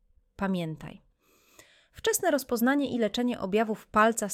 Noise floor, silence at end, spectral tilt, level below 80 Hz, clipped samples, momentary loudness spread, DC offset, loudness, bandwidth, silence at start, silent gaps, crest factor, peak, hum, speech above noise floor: -64 dBFS; 0 s; -4 dB/octave; -60 dBFS; under 0.1%; 10 LU; under 0.1%; -28 LUFS; 17 kHz; 0.4 s; none; 18 dB; -10 dBFS; none; 37 dB